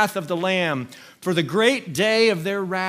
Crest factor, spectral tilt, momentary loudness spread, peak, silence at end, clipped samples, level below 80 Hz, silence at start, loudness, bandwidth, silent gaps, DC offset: 18 dB; -4.5 dB/octave; 10 LU; -4 dBFS; 0 s; under 0.1%; -68 dBFS; 0 s; -21 LUFS; 16 kHz; none; under 0.1%